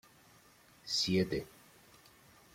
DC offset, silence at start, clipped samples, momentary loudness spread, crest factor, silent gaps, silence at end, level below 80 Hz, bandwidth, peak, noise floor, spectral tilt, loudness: under 0.1%; 0.85 s; under 0.1%; 22 LU; 20 dB; none; 1.05 s; -64 dBFS; 16.5 kHz; -20 dBFS; -63 dBFS; -4 dB/octave; -34 LUFS